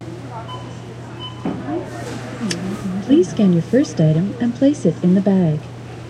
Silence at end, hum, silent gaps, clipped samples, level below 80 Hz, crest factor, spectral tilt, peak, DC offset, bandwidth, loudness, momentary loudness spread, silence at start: 0 s; none; none; under 0.1%; -52 dBFS; 16 dB; -7 dB/octave; -2 dBFS; under 0.1%; 11 kHz; -18 LUFS; 16 LU; 0 s